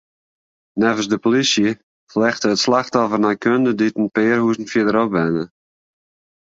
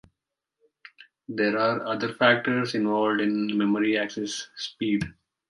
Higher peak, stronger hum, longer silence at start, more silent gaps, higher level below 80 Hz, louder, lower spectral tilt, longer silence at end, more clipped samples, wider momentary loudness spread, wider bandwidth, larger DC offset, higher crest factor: first, -2 dBFS vs -6 dBFS; neither; second, 0.75 s vs 1 s; first, 1.83-2.07 s vs none; about the same, -58 dBFS vs -60 dBFS; first, -18 LUFS vs -25 LUFS; about the same, -4.5 dB/octave vs -5 dB/octave; first, 1.1 s vs 0.4 s; neither; second, 5 LU vs 11 LU; second, 8 kHz vs 11.5 kHz; neither; second, 16 dB vs 22 dB